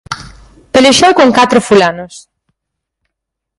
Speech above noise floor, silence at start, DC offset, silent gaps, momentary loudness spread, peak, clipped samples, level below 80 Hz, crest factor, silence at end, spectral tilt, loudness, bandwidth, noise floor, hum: 68 dB; 0.1 s; under 0.1%; none; 19 LU; 0 dBFS; 0.1%; -44 dBFS; 12 dB; 1.4 s; -3.5 dB/octave; -8 LUFS; 11.5 kHz; -77 dBFS; none